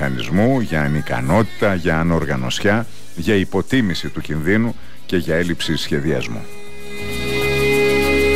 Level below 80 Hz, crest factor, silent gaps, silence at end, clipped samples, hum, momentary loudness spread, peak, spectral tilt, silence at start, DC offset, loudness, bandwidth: -36 dBFS; 14 dB; none; 0 s; under 0.1%; none; 12 LU; -6 dBFS; -5.5 dB/octave; 0 s; 5%; -19 LUFS; 16 kHz